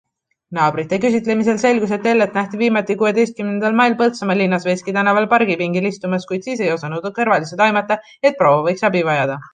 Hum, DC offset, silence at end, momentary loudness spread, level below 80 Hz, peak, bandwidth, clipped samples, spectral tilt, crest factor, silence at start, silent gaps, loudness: none; under 0.1%; 0.05 s; 6 LU; -62 dBFS; -2 dBFS; 9.6 kHz; under 0.1%; -6 dB/octave; 14 dB; 0.5 s; none; -17 LUFS